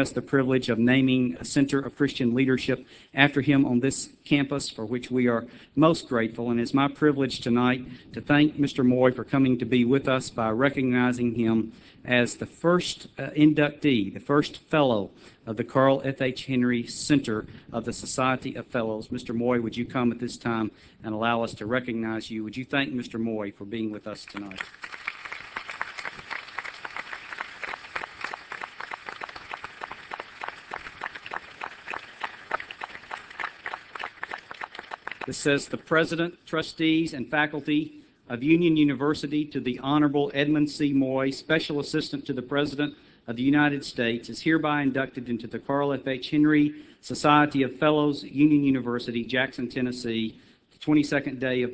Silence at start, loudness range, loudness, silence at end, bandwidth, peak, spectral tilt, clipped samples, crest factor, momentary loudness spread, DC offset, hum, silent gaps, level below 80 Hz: 0 s; 12 LU; -26 LUFS; 0 s; 8 kHz; -2 dBFS; -5.5 dB/octave; under 0.1%; 24 dB; 15 LU; under 0.1%; none; none; -58 dBFS